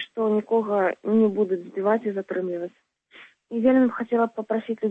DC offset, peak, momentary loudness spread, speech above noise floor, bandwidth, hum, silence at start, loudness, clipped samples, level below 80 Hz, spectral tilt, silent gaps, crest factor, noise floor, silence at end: under 0.1%; -8 dBFS; 8 LU; 28 dB; 4 kHz; none; 0 s; -24 LUFS; under 0.1%; -70 dBFS; -8.5 dB/octave; none; 16 dB; -51 dBFS; 0 s